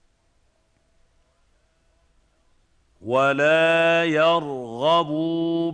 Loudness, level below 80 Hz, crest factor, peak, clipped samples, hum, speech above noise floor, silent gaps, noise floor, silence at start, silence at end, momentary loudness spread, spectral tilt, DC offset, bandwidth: -20 LUFS; -64 dBFS; 16 dB; -8 dBFS; under 0.1%; none; 45 dB; none; -65 dBFS; 3 s; 0 s; 8 LU; -5.5 dB/octave; under 0.1%; 9.2 kHz